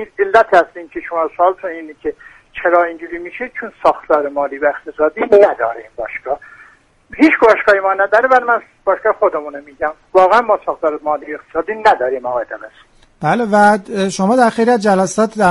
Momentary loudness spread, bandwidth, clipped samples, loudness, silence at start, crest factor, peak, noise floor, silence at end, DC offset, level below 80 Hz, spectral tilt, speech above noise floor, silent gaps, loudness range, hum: 15 LU; 11.5 kHz; under 0.1%; -14 LUFS; 0 s; 14 dB; 0 dBFS; -46 dBFS; 0 s; under 0.1%; -52 dBFS; -5.5 dB/octave; 32 dB; none; 4 LU; none